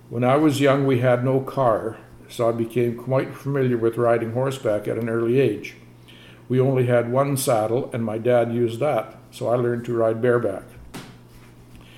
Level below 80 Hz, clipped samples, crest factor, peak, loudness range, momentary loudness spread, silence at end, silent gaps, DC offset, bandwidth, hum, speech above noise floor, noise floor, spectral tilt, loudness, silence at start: -56 dBFS; under 0.1%; 16 dB; -6 dBFS; 2 LU; 12 LU; 0.15 s; none; under 0.1%; 16 kHz; none; 25 dB; -46 dBFS; -7 dB/octave; -22 LUFS; 0.1 s